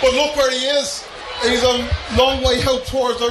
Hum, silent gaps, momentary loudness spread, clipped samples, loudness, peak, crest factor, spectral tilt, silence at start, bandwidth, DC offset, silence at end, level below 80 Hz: none; none; 6 LU; under 0.1%; -17 LUFS; -2 dBFS; 16 dB; -3.5 dB/octave; 0 s; 13 kHz; under 0.1%; 0 s; -32 dBFS